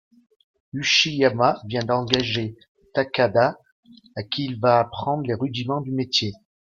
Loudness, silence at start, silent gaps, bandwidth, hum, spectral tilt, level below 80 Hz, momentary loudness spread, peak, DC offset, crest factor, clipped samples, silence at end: -22 LUFS; 0.75 s; 2.68-2.75 s, 3.72-3.83 s; 7.4 kHz; none; -4.5 dB/octave; -58 dBFS; 10 LU; -2 dBFS; under 0.1%; 22 dB; under 0.1%; 0.4 s